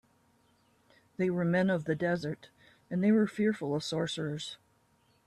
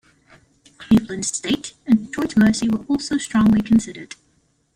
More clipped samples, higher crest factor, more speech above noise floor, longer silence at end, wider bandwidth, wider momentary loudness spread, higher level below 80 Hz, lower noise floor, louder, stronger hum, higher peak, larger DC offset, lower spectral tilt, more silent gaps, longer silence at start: neither; about the same, 14 dB vs 16 dB; second, 39 dB vs 44 dB; about the same, 0.7 s vs 0.7 s; about the same, 12 kHz vs 11 kHz; first, 14 LU vs 8 LU; second, -70 dBFS vs -46 dBFS; first, -69 dBFS vs -63 dBFS; second, -31 LUFS vs -19 LUFS; neither; second, -18 dBFS vs -4 dBFS; neither; first, -6.5 dB/octave vs -5 dB/octave; neither; first, 1.2 s vs 0.8 s